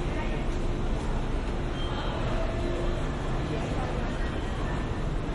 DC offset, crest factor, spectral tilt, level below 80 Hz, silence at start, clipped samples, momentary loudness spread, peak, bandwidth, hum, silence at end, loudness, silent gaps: under 0.1%; 12 dB; -6.5 dB/octave; -32 dBFS; 0 s; under 0.1%; 2 LU; -16 dBFS; 11 kHz; none; 0 s; -32 LUFS; none